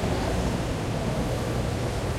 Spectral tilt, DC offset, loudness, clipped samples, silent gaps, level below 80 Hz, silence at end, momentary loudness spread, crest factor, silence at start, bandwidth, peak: -6 dB/octave; under 0.1%; -28 LUFS; under 0.1%; none; -34 dBFS; 0 s; 2 LU; 12 dB; 0 s; 16 kHz; -14 dBFS